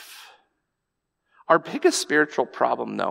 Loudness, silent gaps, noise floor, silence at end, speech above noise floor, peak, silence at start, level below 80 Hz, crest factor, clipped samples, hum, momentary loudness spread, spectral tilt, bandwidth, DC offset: -22 LUFS; none; -80 dBFS; 0 s; 58 dB; -4 dBFS; 0 s; -80 dBFS; 22 dB; under 0.1%; none; 5 LU; -3 dB/octave; 16 kHz; under 0.1%